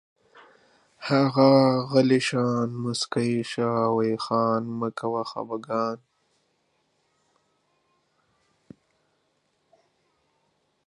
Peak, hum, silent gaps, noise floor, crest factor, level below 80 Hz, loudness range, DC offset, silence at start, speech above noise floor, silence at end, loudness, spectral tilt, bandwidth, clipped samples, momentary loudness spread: -6 dBFS; none; none; -71 dBFS; 22 dB; -72 dBFS; 13 LU; under 0.1%; 1 s; 48 dB; 4.9 s; -24 LUFS; -6 dB/octave; 11.5 kHz; under 0.1%; 12 LU